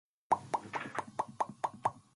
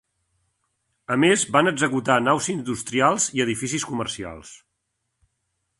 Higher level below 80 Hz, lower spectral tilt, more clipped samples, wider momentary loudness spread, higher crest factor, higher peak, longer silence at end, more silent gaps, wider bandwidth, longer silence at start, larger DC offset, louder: second, -74 dBFS vs -58 dBFS; about the same, -4.5 dB/octave vs -3.5 dB/octave; neither; second, 6 LU vs 13 LU; about the same, 22 dB vs 22 dB; second, -16 dBFS vs -2 dBFS; second, 0.15 s vs 1.25 s; neither; about the same, 11.5 kHz vs 11.5 kHz; second, 0.3 s vs 1.1 s; neither; second, -37 LUFS vs -21 LUFS